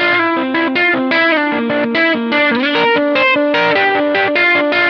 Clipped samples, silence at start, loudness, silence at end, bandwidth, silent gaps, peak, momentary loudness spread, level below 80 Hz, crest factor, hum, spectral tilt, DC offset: under 0.1%; 0 s; -12 LUFS; 0 s; 6.6 kHz; none; -2 dBFS; 4 LU; -62 dBFS; 12 dB; none; -5.5 dB/octave; under 0.1%